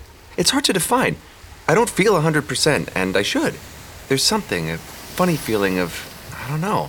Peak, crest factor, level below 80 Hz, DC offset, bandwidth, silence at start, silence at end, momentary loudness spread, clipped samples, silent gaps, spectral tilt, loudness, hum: -2 dBFS; 18 dB; -46 dBFS; under 0.1%; over 20 kHz; 0 s; 0 s; 15 LU; under 0.1%; none; -4 dB/octave; -19 LUFS; none